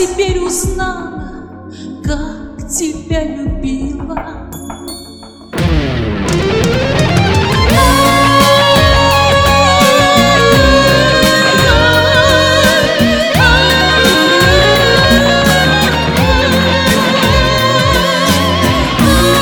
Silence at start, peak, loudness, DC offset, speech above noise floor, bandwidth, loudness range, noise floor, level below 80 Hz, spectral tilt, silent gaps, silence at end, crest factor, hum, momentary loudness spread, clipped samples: 0 s; 0 dBFS; -9 LUFS; under 0.1%; 16 dB; over 20 kHz; 12 LU; -32 dBFS; -22 dBFS; -4 dB/octave; none; 0 s; 10 dB; none; 15 LU; 0.2%